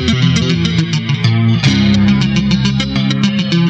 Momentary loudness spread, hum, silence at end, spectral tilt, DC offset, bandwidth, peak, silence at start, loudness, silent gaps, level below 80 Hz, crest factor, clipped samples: 4 LU; none; 0 s; -6 dB/octave; under 0.1%; 8.4 kHz; 0 dBFS; 0 s; -13 LUFS; none; -32 dBFS; 12 dB; under 0.1%